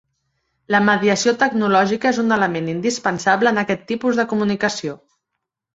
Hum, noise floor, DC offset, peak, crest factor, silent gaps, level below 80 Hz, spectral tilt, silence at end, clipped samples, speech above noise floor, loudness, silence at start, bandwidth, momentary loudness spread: none; -79 dBFS; under 0.1%; -2 dBFS; 18 dB; none; -60 dBFS; -4.5 dB/octave; 0.8 s; under 0.1%; 61 dB; -18 LUFS; 0.7 s; 8 kHz; 6 LU